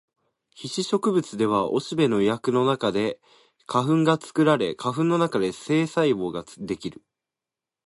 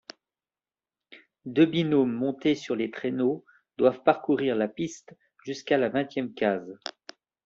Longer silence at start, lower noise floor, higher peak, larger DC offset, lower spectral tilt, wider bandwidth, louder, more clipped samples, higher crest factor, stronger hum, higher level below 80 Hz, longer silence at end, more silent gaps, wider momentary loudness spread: second, 0.6 s vs 1.1 s; about the same, -89 dBFS vs under -90 dBFS; about the same, -6 dBFS vs -6 dBFS; neither; about the same, -6 dB/octave vs -5 dB/octave; first, 11.5 kHz vs 7.6 kHz; about the same, -24 LUFS vs -26 LUFS; neither; about the same, 18 dB vs 20 dB; neither; first, -64 dBFS vs -70 dBFS; first, 0.95 s vs 0.7 s; neither; second, 11 LU vs 16 LU